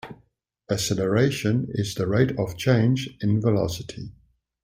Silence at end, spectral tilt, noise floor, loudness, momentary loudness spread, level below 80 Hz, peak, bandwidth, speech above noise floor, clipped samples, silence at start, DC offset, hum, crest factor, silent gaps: 0.5 s; -6 dB/octave; -64 dBFS; -24 LUFS; 14 LU; -52 dBFS; -6 dBFS; 16 kHz; 41 dB; under 0.1%; 0.05 s; under 0.1%; none; 18 dB; none